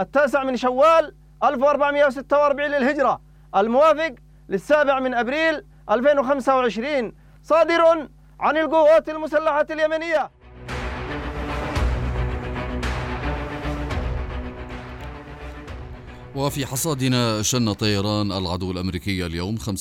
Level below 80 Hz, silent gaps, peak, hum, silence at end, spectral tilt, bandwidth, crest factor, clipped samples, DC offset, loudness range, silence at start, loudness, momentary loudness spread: -36 dBFS; none; -6 dBFS; none; 0 s; -5 dB/octave; 16 kHz; 14 dB; under 0.1%; under 0.1%; 10 LU; 0 s; -21 LUFS; 16 LU